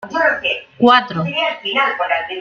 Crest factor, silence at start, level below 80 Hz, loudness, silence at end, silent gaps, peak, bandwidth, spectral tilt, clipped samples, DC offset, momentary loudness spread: 16 dB; 0 s; -58 dBFS; -16 LUFS; 0 s; none; -2 dBFS; 7.4 kHz; -5.5 dB/octave; under 0.1%; under 0.1%; 7 LU